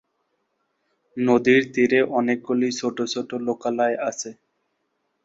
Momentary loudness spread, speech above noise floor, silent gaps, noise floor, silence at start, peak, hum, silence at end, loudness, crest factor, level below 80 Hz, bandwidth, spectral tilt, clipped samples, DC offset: 10 LU; 52 dB; none; -74 dBFS; 1.15 s; -6 dBFS; none; 0.9 s; -22 LUFS; 18 dB; -68 dBFS; 7.8 kHz; -4.5 dB/octave; under 0.1%; under 0.1%